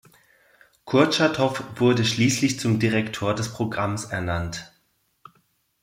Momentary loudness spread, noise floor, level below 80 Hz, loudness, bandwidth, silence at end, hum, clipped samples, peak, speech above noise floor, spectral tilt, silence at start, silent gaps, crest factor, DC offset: 8 LU; -68 dBFS; -54 dBFS; -23 LUFS; 16 kHz; 1.15 s; none; under 0.1%; -4 dBFS; 46 dB; -5 dB/octave; 0.85 s; none; 20 dB; under 0.1%